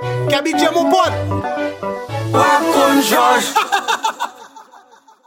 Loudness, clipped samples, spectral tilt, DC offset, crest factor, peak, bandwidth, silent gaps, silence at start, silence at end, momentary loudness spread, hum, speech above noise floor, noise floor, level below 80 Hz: -15 LUFS; under 0.1%; -4 dB/octave; under 0.1%; 16 dB; -2 dBFS; 17 kHz; none; 0 s; 0.65 s; 11 LU; none; 31 dB; -46 dBFS; -52 dBFS